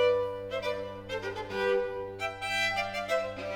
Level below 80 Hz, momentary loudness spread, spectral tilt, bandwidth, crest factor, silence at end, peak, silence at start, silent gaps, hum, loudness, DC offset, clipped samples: -58 dBFS; 8 LU; -3.5 dB/octave; 17.5 kHz; 16 dB; 0 s; -16 dBFS; 0 s; none; none; -32 LUFS; under 0.1%; under 0.1%